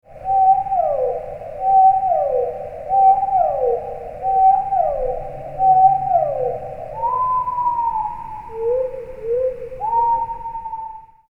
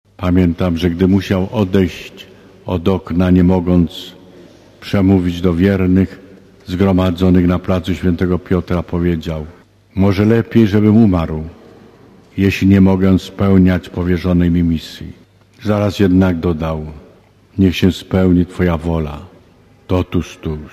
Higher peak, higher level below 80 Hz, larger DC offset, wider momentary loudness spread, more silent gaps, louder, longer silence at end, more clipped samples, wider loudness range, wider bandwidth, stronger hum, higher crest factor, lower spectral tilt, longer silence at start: second, -4 dBFS vs 0 dBFS; second, -42 dBFS vs -28 dBFS; neither; about the same, 15 LU vs 15 LU; neither; second, -18 LUFS vs -14 LUFS; first, 0.25 s vs 0.05 s; neither; about the same, 5 LU vs 3 LU; second, 3 kHz vs 14.5 kHz; neither; about the same, 16 dB vs 14 dB; about the same, -8 dB/octave vs -8 dB/octave; about the same, 0.1 s vs 0.2 s